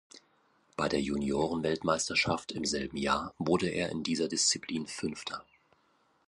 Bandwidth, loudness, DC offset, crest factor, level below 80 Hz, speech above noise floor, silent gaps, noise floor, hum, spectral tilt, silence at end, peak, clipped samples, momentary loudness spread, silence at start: 11.5 kHz; -31 LUFS; under 0.1%; 20 dB; -58 dBFS; 38 dB; none; -70 dBFS; none; -3.5 dB/octave; 0.85 s; -12 dBFS; under 0.1%; 9 LU; 0.15 s